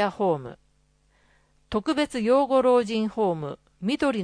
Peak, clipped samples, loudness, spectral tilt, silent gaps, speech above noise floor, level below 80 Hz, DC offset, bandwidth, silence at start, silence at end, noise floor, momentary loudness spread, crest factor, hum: -10 dBFS; under 0.1%; -24 LUFS; -6 dB/octave; none; 41 dB; -58 dBFS; under 0.1%; 10.5 kHz; 0 s; 0 s; -65 dBFS; 12 LU; 16 dB; none